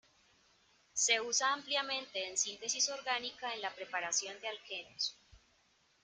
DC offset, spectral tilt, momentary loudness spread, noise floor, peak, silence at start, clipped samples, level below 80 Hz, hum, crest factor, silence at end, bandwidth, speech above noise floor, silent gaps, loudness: under 0.1%; 1.5 dB/octave; 11 LU; -72 dBFS; -16 dBFS; 0.95 s; under 0.1%; -78 dBFS; none; 24 dB; 0.65 s; 11 kHz; 35 dB; none; -35 LUFS